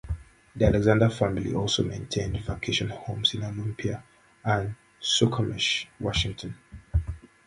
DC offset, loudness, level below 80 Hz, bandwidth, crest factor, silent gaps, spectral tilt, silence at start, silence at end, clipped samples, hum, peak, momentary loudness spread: under 0.1%; -27 LUFS; -40 dBFS; 11.5 kHz; 22 dB; none; -5 dB/octave; 0.05 s; 0.2 s; under 0.1%; none; -6 dBFS; 15 LU